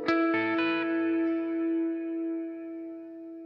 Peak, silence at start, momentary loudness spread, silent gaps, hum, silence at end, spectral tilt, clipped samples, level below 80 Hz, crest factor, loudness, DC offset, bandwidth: -14 dBFS; 0 s; 14 LU; none; none; 0 s; -6.5 dB/octave; under 0.1%; -76 dBFS; 16 dB; -29 LUFS; under 0.1%; 5.6 kHz